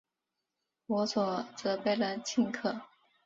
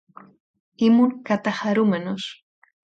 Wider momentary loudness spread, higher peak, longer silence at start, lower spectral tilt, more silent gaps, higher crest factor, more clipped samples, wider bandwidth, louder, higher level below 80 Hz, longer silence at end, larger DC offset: second, 5 LU vs 13 LU; second, -18 dBFS vs -8 dBFS; about the same, 0.9 s vs 0.8 s; second, -4.5 dB/octave vs -6.5 dB/octave; neither; about the same, 16 dB vs 16 dB; neither; about the same, 7.8 kHz vs 7.8 kHz; second, -33 LUFS vs -21 LUFS; second, -76 dBFS vs -68 dBFS; second, 0.4 s vs 0.65 s; neither